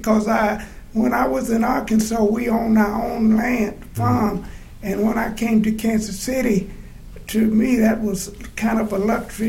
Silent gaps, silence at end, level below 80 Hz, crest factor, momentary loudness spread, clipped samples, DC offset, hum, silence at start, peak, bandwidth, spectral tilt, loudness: none; 0 s; -38 dBFS; 16 dB; 10 LU; under 0.1%; under 0.1%; none; 0 s; -4 dBFS; 16 kHz; -6 dB/octave; -20 LUFS